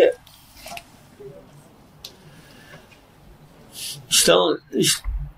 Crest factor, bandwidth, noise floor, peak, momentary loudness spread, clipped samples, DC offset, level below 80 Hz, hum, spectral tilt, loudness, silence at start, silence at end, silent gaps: 22 dB; 16 kHz; -50 dBFS; -2 dBFS; 27 LU; under 0.1%; under 0.1%; -40 dBFS; none; -2.5 dB/octave; -19 LUFS; 0 s; 0.05 s; none